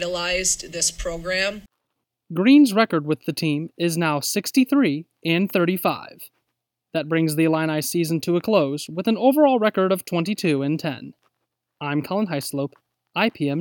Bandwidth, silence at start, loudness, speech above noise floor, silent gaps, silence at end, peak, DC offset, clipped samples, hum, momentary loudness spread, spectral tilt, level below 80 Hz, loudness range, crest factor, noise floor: over 20 kHz; 0 s; -21 LUFS; 58 dB; none; 0 s; -6 dBFS; under 0.1%; under 0.1%; none; 12 LU; -4.5 dB/octave; -50 dBFS; 4 LU; 16 dB; -79 dBFS